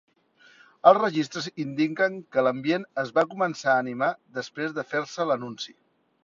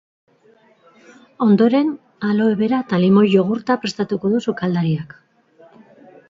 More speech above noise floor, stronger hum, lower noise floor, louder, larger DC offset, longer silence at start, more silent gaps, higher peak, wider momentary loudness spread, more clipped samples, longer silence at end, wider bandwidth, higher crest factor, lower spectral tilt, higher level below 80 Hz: second, 33 dB vs 37 dB; neither; first, -58 dBFS vs -54 dBFS; second, -25 LUFS vs -18 LUFS; neither; second, 0.85 s vs 1.4 s; neither; about the same, -2 dBFS vs -2 dBFS; about the same, 11 LU vs 9 LU; neither; second, 0.55 s vs 1.25 s; about the same, 7.6 kHz vs 7.6 kHz; first, 24 dB vs 16 dB; second, -5 dB/octave vs -7.5 dB/octave; second, -74 dBFS vs -62 dBFS